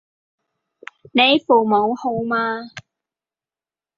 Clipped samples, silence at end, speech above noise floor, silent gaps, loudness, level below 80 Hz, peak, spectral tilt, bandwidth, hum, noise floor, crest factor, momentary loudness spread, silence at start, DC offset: under 0.1%; 1.2 s; over 73 dB; none; -17 LUFS; -64 dBFS; -2 dBFS; -5.5 dB/octave; 7.6 kHz; none; under -90 dBFS; 20 dB; 11 LU; 1.15 s; under 0.1%